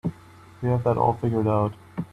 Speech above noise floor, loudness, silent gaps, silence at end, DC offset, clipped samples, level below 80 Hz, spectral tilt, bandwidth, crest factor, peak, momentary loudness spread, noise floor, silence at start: 26 dB; -24 LUFS; none; 0.05 s; under 0.1%; under 0.1%; -52 dBFS; -10 dB/octave; 8.8 kHz; 16 dB; -8 dBFS; 10 LU; -48 dBFS; 0.05 s